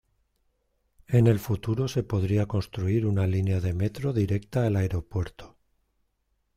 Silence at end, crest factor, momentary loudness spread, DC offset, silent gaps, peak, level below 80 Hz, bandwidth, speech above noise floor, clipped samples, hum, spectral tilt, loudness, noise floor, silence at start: 1.1 s; 18 dB; 7 LU; under 0.1%; none; -8 dBFS; -50 dBFS; 15 kHz; 49 dB; under 0.1%; none; -8 dB/octave; -27 LUFS; -74 dBFS; 1.1 s